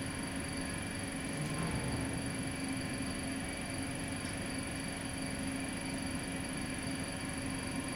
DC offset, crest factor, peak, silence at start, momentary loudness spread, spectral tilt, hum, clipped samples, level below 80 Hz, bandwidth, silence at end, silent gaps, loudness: under 0.1%; 14 dB; -24 dBFS; 0 s; 2 LU; -4 dB/octave; none; under 0.1%; -52 dBFS; 16.5 kHz; 0 s; none; -38 LUFS